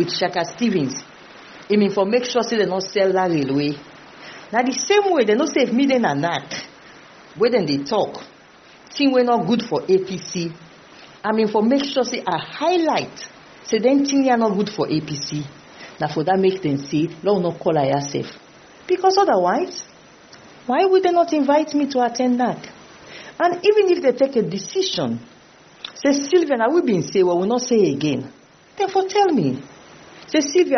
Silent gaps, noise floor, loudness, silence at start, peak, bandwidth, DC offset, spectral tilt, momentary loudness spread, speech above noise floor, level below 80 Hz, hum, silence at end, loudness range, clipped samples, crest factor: none; -48 dBFS; -19 LUFS; 0 s; -4 dBFS; 6.6 kHz; under 0.1%; -4 dB/octave; 16 LU; 29 dB; -64 dBFS; none; 0 s; 2 LU; under 0.1%; 16 dB